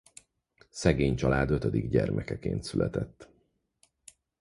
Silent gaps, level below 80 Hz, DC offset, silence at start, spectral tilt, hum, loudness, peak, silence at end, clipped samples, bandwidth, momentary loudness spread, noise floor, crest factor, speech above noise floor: none; -44 dBFS; under 0.1%; 0.75 s; -6.5 dB/octave; none; -29 LUFS; -8 dBFS; 1.15 s; under 0.1%; 11.5 kHz; 8 LU; -71 dBFS; 22 dB; 43 dB